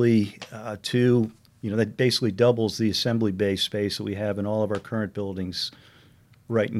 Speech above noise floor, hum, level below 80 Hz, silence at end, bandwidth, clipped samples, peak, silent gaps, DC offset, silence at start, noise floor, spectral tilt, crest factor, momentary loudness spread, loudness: 31 dB; none; -62 dBFS; 0 s; 15 kHz; under 0.1%; -8 dBFS; none; under 0.1%; 0 s; -55 dBFS; -6 dB/octave; 18 dB; 10 LU; -25 LUFS